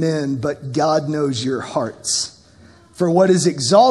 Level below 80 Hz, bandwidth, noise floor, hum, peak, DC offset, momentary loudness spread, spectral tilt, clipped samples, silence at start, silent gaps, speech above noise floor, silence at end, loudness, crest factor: -58 dBFS; 12.5 kHz; -47 dBFS; none; 0 dBFS; under 0.1%; 9 LU; -4.5 dB/octave; under 0.1%; 0 s; none; 30 dB; 0 s; -18 LUFS; 18 dB